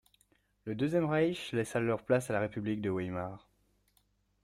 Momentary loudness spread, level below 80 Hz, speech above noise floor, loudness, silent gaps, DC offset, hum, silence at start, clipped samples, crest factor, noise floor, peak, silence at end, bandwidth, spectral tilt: 12 LU; -66 dBFS; 41 dB; -33 LUFS; none; under 0.1%; 50 Hz at -60 dBFS; 0.65 s; under 0.1%; 18 dB; -73 dBFS; -16 dBFS; 1.05 s; 15.5 kHz; -6.5 dB/octave